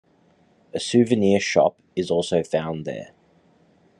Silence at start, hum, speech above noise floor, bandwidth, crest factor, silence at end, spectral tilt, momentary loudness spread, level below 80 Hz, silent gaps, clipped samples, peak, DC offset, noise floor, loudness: 0.75 s; none; 38 dB; 10.5 kHz; 20 dB; 0.95 s; -5.5 dB/octave; 14 LU; -64 dBFS; none; under 0.1%; -4 dBFS; under 0.1%; -59 dBFS; -22 LUFS